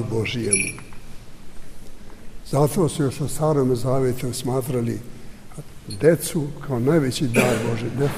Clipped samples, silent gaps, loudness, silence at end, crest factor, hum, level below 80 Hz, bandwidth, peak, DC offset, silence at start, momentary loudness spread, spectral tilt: under 0.1%; none; -22 LUFS; 0 s; 20 dB; none; -42 dBFS; 16 kHz; -4 dBFS; under 0.1%; 0 s; 20 LU; -5.5 dB/octave